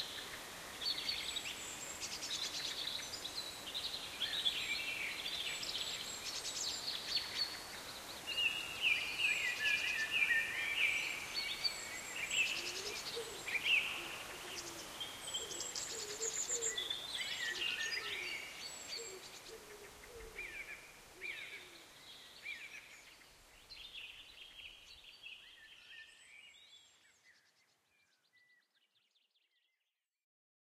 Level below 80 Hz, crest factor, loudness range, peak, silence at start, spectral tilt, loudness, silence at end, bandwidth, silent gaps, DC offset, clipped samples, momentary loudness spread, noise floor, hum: -70 dBFS; 22 dB; 18 LU; -20 dBFS; 0 s; 0.5 dB/octave; -38 LUFS; 3.35 s; 15.5 kHz; none; under 0.1%; under 0.1%; 20 LU; -89 dBFS; none